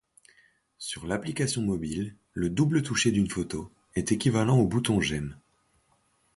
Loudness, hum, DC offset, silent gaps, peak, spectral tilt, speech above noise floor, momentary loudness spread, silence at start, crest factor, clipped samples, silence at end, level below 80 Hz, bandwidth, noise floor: -28 LUFS; none; under 0.1%; none; -10 dBFS; -5 dB/octave; 42 dB; 13 LU; 0.8 s; 18 dB; under 0.1%; 1 s; -50 dBFS; 11.5 kHz; -69 dBFS